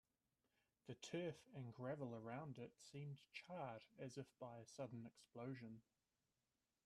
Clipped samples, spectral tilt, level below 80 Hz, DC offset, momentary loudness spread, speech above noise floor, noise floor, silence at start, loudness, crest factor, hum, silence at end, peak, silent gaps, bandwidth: under 0.1%; -6 dB/octave; -88 dBFS; under 0.1%; 8 LU; over 36 dB; under -90 dBFS; 0.85 s; -55 LUFS; 18 dB; none; 1.05 s; -38 dBFS; none; 13 kHz